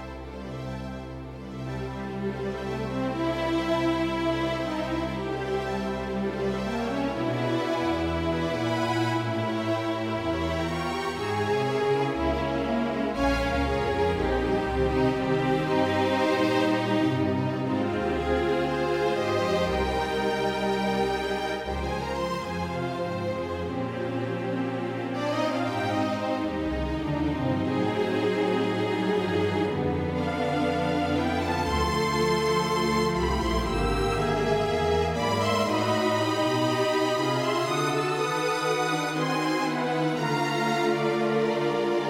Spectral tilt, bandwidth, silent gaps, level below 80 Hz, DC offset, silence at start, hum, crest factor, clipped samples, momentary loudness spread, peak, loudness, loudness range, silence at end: -5.5 dB/octave; 16 kHz; none; -42 dBFS; under 0.1%; 0 s; none; 16 dB; under 0.1%; 6 LU; -12 dBFS; -27 LUFS; 4 LU; 0 s